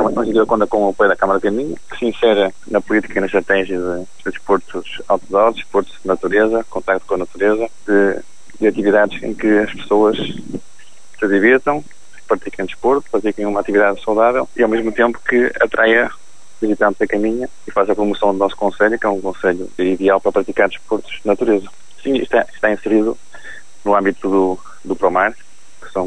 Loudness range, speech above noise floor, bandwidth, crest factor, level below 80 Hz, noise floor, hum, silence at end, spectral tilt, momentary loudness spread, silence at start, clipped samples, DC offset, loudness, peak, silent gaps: 2 LU; 31 dB; 10.5 kHz; 16 dB; -46 dBFS; -47 dBFS; none; 0 s; -5.5 dB/octave; 9 LU; 0 s; under 0.1%; 3%; -17 LUFS; 0 dBFS; none